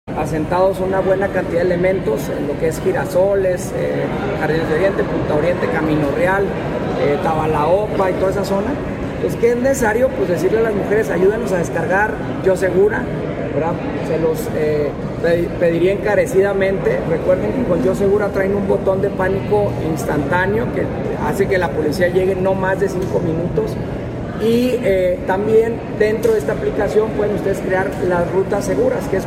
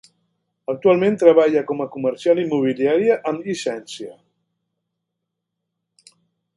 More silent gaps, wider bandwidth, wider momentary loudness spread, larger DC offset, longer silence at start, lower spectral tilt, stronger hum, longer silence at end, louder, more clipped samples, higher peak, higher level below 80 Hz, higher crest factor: neither; first, 16 kHz vs 11.5 kHz; second, 5 LU vs 18 LU; neither; second, 0.05 s vs 0.7 s; about the same, -6.5 dB/octave vs -6 dB/octave; neither; second, 0 s vs 2.45 s; about the same, -17 LUFS vs -18 LUFS; neither; about the same, -2 dBFS vs 0 dBFS; first, -36 dBFS vs -70 dBFS; second, 14 dB vs 20 dB